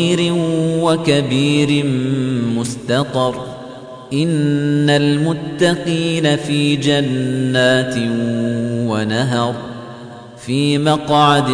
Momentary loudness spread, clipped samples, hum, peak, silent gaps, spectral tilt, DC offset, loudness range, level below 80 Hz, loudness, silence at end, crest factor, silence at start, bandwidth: 13 LU; under 0.1%; none; -2 dBFS; none; -5.5 dB/octave; under 0.1%; 3 LU; -52 dBFS; -16 LUFS; 0 s; 14 dB; 0 s; 10.5 kHz